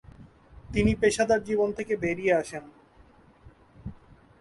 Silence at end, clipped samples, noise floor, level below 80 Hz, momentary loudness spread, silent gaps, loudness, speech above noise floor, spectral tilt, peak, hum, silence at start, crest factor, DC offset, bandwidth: 0.45 s; under 0.1%; -56 dBFS; -46 dBFS; 21 LU; none; -26 LUFS; 31 dB; -5.5 dB/octave; -10 dBFS; none; 0.2 s; 18 dB; under 0.1%; 11.5 kHz